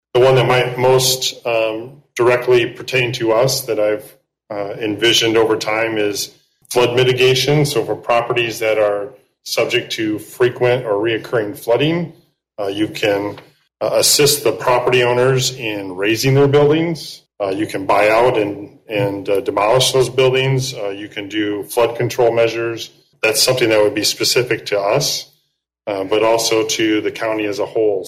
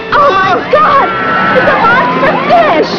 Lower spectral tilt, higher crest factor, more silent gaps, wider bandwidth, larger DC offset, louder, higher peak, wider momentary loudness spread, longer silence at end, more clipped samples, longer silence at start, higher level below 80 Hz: second, -4 dB/octave vs -6 dB/octave; first, 14 dB vs 8 dB; neither; first, 16 kHz vs 5.4 kHz; neither; second, -16 LUFS vs -8 LUFS; about the same, -2 dBFS vs 0 dBFS; first, 11 LU vs 3 LU; about the same, 0 s vs 0 s; second, under 0.1% vs 1%; first, 0.15 s vs 0 s; second, -52 dBFS vs -40 dBFS